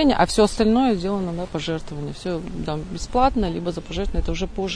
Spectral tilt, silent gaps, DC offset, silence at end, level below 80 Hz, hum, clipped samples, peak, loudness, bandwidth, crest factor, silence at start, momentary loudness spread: -5.5 dB/octave; none; 0.2%; 0 s; -32 dBFS; none; under 0.1%; -4 dBFS; -23 LUFS; 10.5 kHz; 18 dB; 0 s; 11 LU